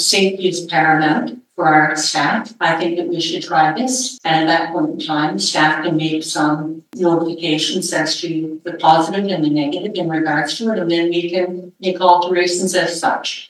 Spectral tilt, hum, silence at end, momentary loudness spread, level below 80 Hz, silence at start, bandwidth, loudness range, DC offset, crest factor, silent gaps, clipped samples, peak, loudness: -3.5 dB/octave; none; 0.05 s; 7 LU; -76 dBFS; 0 s; 13 kHz; 2 LU; under 0.1%; 16 dB; none; under 0.1%; 0 dBFS; -16 LUFS